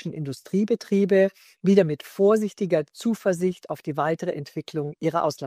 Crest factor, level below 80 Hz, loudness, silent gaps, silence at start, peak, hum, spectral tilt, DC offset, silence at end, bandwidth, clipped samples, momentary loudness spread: 18 dB; -70 dBFS; -24 LUFS; none; 0.05 s; -4 dBFS; none; -7 dB/octave; under 0.1%; 0 s; 15.5 kHz; under 0.1%; 11 LU